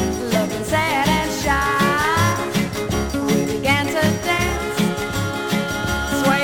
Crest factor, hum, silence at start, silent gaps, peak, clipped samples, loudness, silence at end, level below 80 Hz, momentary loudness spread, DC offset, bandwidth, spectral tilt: 16 dB; none; 0 s; none; -4 dBFS; under 0.1%; -19 LUFS; 0 s; -34 dBFS; 5 LU; 0.1%; 19 kHz; -4.5 dB/octave